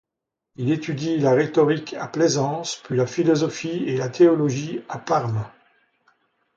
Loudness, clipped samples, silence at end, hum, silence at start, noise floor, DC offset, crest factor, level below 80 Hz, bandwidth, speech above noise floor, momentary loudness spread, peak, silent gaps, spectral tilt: -22 LUFS; under 0.1%; 1.1 s; none; 0.6 s; -84 dBFS; under 0.1%; 18 dB; -64 dBFS; 7.8 kHz; 63 dB; 11 LU; -4 dBFS; none; -6 dB/octave